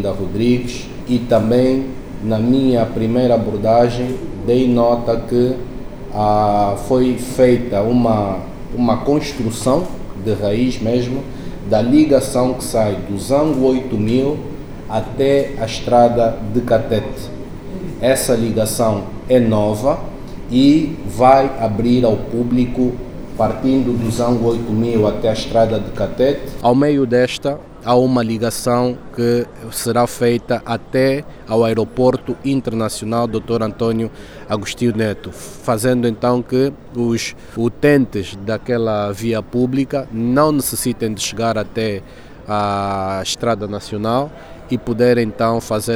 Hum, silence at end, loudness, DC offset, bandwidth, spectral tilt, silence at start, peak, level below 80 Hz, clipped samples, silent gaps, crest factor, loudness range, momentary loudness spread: none; 0 s; -17 LUFS; under 0.1%; over 20 kHz; -6 dB/octave; 0 s; 0 dBFS; -36 dBFS; under 0.1%; none; 16 dB; 4 LU; 10 LU